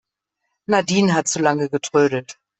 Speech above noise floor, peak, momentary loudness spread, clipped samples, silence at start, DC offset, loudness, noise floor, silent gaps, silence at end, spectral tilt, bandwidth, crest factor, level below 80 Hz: 59 dB; -2 dBFS; 6 LU; under 0.1%; 0.7 s; under 0.1%; -19 LUFS; -77 dBFS; none; 0.25 s; -4.5 dB/octave; 8.4 kHz; 18 dB; -60 dBFS